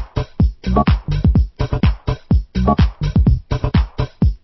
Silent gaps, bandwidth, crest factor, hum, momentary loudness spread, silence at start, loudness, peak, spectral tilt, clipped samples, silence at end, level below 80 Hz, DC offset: none; 6 kHz; 14 dB; none; 4 LU; 0 s; -18 LUFS; -2 dBFS; -9 dB/octave; under 0.1%; 0.05 s; -20 dBFS; under 0.1%